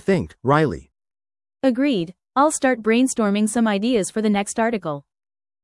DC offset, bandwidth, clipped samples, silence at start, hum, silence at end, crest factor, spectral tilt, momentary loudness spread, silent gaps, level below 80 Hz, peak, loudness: under 0.1%; 12 kHz; under 0.1%; 0.05 s; none; 0.65 s; 16 dB; -5 dB/octave; 7 LU; none; -54 dBFS; -4 dBFS; -20 LUFS